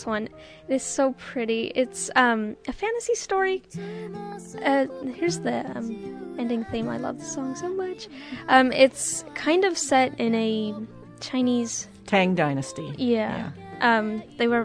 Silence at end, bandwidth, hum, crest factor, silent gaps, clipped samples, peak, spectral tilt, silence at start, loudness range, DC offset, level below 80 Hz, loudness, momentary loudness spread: 0 s; 11 kHz; none; 22 dB; none; under 0.1%; -4 dBFS; -4 dB/octave; 0 s; 6 LU; under 0.1%; -58 dBFS; -25 LUFS; 15 LU